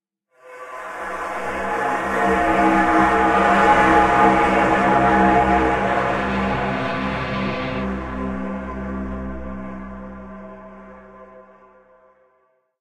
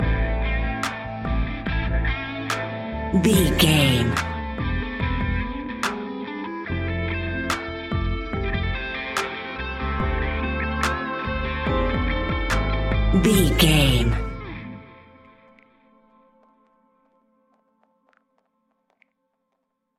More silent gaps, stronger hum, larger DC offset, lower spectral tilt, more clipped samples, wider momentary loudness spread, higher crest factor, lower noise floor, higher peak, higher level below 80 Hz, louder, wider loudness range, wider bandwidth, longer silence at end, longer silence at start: neither; neither; neither; about the same, -6 dB/octave vs -5 dB/octave; neither; first, 20 LU vs 12 LU; about the same, 18 dB vs 22 dB; second, -64 dBFS vs -76 dBFS; about the same, -4 dBFS vs -2 dBFS; second, -38 dBFS vs -30 dBFS; first, -18 LUFS vs -23 LUFS; first, 18 LU vs 6 LU; second, 13 kHz vs 16 kHz; second, 1.4 s vs 5 s; first, 0.45 s vs 0 s